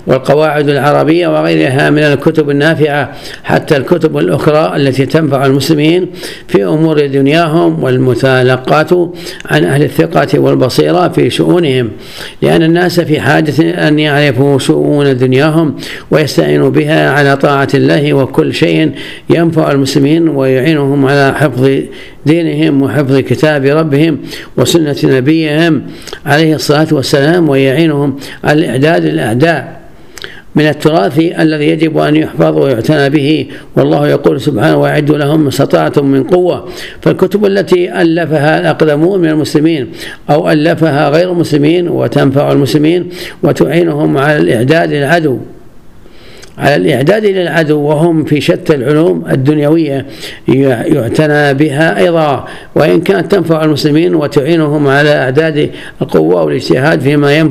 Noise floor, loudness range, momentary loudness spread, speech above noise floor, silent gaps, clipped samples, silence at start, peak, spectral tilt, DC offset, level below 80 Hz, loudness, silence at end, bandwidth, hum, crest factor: -36 dBFS; 1 LU; 5 LU; 27 dB; none; 0.7%; 0.05 s; 0 dBFS; -6.5 dB/octave; 1%; -42 dBFS; -9 LUFS; 0 s; 14.5 kHz; none; 10 dB